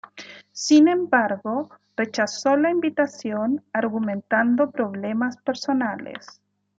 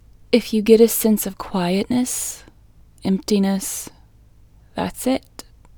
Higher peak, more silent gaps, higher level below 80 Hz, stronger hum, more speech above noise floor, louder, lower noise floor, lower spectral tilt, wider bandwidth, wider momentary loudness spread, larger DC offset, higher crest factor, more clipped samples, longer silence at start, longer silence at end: second, -4 dBFS vs 0 dBFS; neither; second, -74 dBFS vs -48 dBFS; first, 50 Hz at -45 dBFS vs none; second, 22 dB vs 31 dB; about the same, -22 LUFS vs -20 LUFS; second, -44 dBFS vs -50 dBFS; about the same, -4.5 dB/octave vs -5 dB/octave; second, 7.8 kHz vs over 20 kHz; about the same, 15 LU vs 15 LU; neither; about the same, 18 dB vs 20 dB; neither; second, 0.15 s vs 0.3 s; about the same, 0.6 s vs 0.6 s